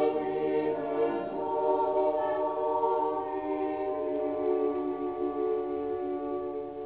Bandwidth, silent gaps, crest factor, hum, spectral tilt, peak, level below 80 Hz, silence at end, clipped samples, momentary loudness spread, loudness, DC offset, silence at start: 4 kHz; none; 14 dB; none; -5.5 dB/octave; -14 dBFS; -64 dBFS; 0 s; under 0.1%; 5 LU; -30 LUFS; under 0.1%; 0 s